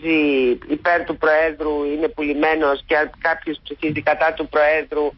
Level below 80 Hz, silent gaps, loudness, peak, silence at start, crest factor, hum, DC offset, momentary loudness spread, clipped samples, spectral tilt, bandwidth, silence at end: -46 dBFS; none; -19 LUFS; -6 dBFS; 0 s; 12 dB; none; under 0.1%; 6 LU; under 0.1%; -10 dB/octave; 5.8 kHz; 0.05 s